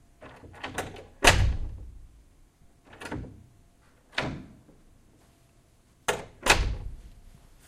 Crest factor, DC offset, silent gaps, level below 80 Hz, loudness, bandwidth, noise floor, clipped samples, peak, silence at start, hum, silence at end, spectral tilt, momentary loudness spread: 28 dB; under 0.1%; none; -38 dBFS; -27 LUFS; 16 kHz; -61 dBFS; under 0.1%; -2 dBFS; 0.2 s; none; 0.4 s; -3 dB/octave; 26 LU